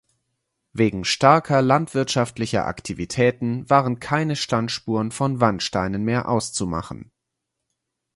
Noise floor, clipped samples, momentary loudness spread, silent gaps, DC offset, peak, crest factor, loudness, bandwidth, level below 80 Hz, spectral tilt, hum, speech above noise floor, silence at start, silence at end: -80 dBFS; under 0.1%; 10 LU; none; under 0.1%; 0 dBFS; 22 dB; -21 LUFS; 11.5 kHz; -50 dBFS; -5 dB/octave; none; 59 dB; 0.75 s; 1.1 s